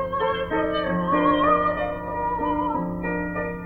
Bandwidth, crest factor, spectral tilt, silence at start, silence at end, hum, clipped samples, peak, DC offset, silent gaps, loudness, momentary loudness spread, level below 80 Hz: 4.6 kHz; 16 dB; -8.5 dB/octave; 0 s; 0 s; none; under 0.1%; -8 dBFS; under 0.1%; none; -23 LUFS; 8 LU; -42 dBFS